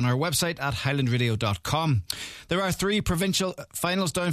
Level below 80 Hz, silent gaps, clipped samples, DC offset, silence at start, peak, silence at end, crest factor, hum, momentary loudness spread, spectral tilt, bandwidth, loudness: -46 dBFS; none; under 0.1%; under 0.1%; 0 s; -10 dBFS; 0 s; 16 dB; none; 5 LU; -4.5 dB/octave; 14 kHz; -26 LUFS